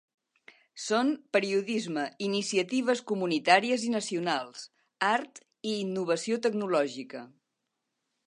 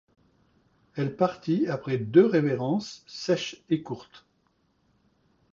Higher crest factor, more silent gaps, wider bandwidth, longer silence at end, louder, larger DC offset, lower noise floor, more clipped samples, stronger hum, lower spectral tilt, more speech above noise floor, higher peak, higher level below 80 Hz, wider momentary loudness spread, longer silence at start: about the same, 24 dB vs 22 dB; neither; first, 11 kHz vs 7.4 kHz; second, 1 s vs 1.35 s; second, -29 LUFS vs -26 LUFS; neither; first, -83 dBFS vs -70 dBFS; neither; neither; second, -4 dB/octave vs -6.5 dB/octave; first, 54 dB vs 44 dB; about the same, -6 dBFS vs -6 dBFS; second, -84 dBFS vs -68 dBFS; about the same, 15 LU vs 17 LU; second, 0.75 s vs 0.95 s